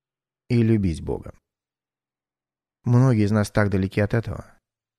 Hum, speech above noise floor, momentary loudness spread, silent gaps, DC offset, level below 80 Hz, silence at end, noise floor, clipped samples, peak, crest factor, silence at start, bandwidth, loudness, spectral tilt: none; over 69 dB; 14 LU; none; under 0.1%; -44 dBFS; 0.55 s; under -90 dBFS; under 0.1%; -6 dBFS; 18 dB; 0.5 s; 13.5 kHz; -22 LUFS; -8 dB/octave